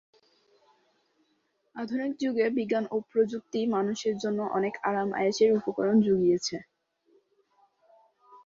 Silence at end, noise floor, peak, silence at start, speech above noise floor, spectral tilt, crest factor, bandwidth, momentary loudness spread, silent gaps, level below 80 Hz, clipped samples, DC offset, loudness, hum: 0.1 s; -73 dBFS; -12 dBFS; 1.75 s; 47 dB; -5.5 dB/octave; 16 dB; 7.6 kHz; 8 LU; none; -70 dBFS; under 0.1%; under 0.1%; -28 LUFS; none